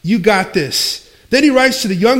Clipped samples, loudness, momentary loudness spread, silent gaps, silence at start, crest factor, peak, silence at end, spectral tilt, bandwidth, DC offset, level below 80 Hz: under 0.1%; -13 LUFS; 6 LU; none; 0.05 s; 14 dB; 0 dBFS; 0 s; -4 dB/octave; 17 kHz; under 0.1%; -46 dBFS